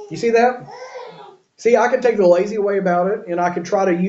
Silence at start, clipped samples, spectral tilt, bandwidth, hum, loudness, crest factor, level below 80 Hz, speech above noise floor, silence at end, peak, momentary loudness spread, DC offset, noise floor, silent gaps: 0 s; under 0.1%; -6 dB/octave; 8 kHz; none; -17 LUFS; 16 dB; -64 dBFS; 26 dB; 0 s; -2 dBFS; 19 LU; under 0.1%; -42 dBFS; none